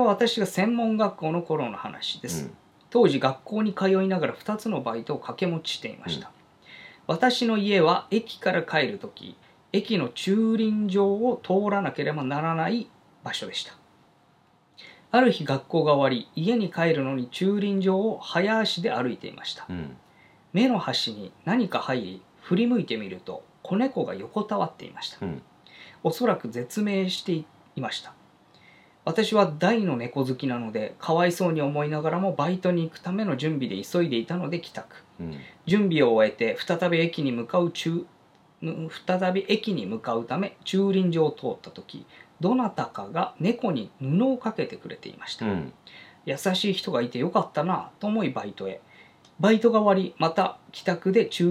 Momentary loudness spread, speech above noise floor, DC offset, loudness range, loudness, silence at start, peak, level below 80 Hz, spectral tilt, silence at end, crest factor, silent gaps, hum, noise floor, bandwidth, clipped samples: 14 LU; 36 dB; under 0.1%; 4 LU; -26 LUFS; 0 s; -6 dBFS; -72 dBFS; -6 dB/octave; 0 s; 20 dB; none; none; -61 dBFS; 15 kHz; under 0.1%